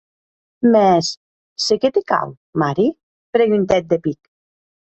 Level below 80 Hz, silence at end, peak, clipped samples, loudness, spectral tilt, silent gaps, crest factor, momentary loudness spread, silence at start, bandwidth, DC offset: -54 dBFS; 0.8 s; -2 dBFS; under 0.1%; -18 LUFS; -5.5 dB/octave; 1.17-1.56 s, 2.37-2.53 s, 3.03-3.33 s; 16 dB; 12 LU; 0.6 s; 8.2 kHz; under 0.1%